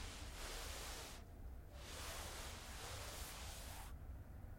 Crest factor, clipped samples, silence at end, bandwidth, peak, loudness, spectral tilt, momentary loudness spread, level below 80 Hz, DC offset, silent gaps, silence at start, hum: 14 dB; under 0.1%; 0 s; 16.5 kHz; -36 dBFS; -51 LUFS; -3 dB/octave; 7 LU; -56 dBFS; under 0.1%; none; 0 s; none